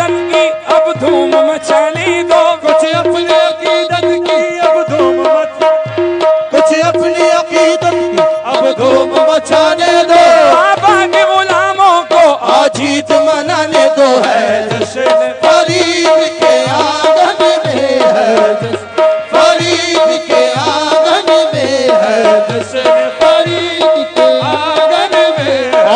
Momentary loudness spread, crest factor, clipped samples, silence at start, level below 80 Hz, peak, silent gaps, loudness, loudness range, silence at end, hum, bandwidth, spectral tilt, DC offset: 4 LU; 10 dB; 0.2%; 0 s; -54 dBFS; 0 dBFS; none; -10 LUFS; 3 LU; 0 s; none; 10 kHz; -4 dB/octave; under 0.1%